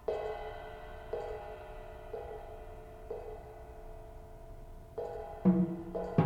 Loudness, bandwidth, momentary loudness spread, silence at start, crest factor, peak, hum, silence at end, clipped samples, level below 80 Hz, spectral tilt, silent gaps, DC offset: -38 LUFS; 7.4 kHz; 20 LU; 0 s; 24 dB; -14 dBFS; none; 0 s; under 0.1%; -52 dBFS; -9.5 dB/octave; none; under 0.1%